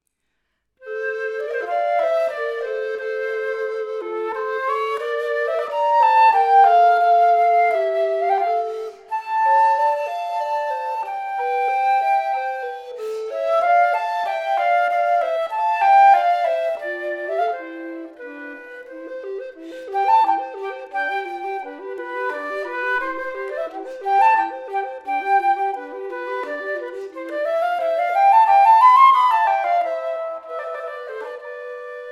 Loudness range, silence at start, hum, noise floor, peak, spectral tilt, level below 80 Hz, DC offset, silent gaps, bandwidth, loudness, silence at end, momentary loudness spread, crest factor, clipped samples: 9 LU; 0.8 s; none; -73 dBFS; -2 dBFS; -2 dB/octave; -74 dBFS; under 0.1%; none; 12.5 kHz; -19 LUFS; 0 s; 18 LU; 18 dB; under 0.1%